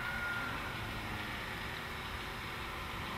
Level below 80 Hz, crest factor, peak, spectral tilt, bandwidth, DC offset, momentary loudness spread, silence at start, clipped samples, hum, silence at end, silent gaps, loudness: -52 dBFS; 14 dB; -26 dBFS; -4 dB/octave; 16 kHz; under 0.1%; 4 LU; 0 s; under 0.1%; none; 0 s; none; -40 LUFS